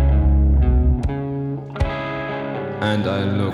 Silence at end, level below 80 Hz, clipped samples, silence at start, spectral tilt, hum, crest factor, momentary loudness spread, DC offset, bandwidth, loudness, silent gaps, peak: 0 s; -20 dBFS; under 0.1%; 0 s; -8.5 dB/octave; none; 14 dB; 9 LU; under 0.1%; 5.2 kHz; -21 LUFS; none; -6 dBFS